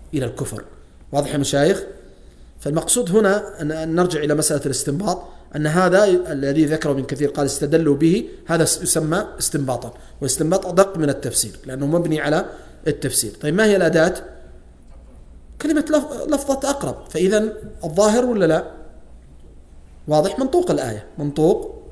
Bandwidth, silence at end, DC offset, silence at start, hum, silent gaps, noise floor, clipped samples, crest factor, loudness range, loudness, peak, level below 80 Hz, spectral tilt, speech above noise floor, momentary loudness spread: 11 kHz; 0 s; under 0.1%; 0 s; none; none; -43 dBFS; under 0.1%; 20 dB; 3 LU; -19 LUFS; 0 dBFS; -42 dBFS; -4.5 dB/octave; 24 dB; 10 LU